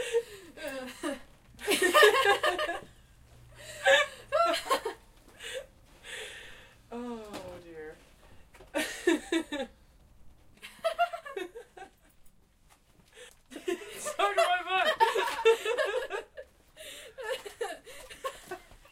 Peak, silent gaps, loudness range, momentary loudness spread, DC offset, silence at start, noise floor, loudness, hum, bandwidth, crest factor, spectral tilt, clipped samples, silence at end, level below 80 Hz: -6 dBFS; none; 13 LU; 22 LU; under 0.1%; 0 s; -63 dBFS; -29 LUFS; none; 16 kHz; 26 dB; -1.5 dB/octave; under 0.1%; 0.15 s; -62 dBFS